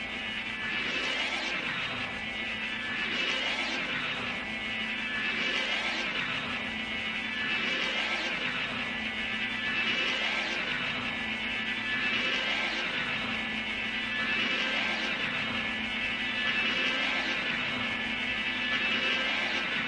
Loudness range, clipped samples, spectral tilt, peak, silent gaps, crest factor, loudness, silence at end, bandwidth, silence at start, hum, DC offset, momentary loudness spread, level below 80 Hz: 2 LU; under 0.1%; -2.5 dB/octave; -16 dBFS; none; 16 dB; -29 LUFS; 0 s; 11.5 kHz; 0 s; none; under 0.1%; 5 LU; -58 dBFS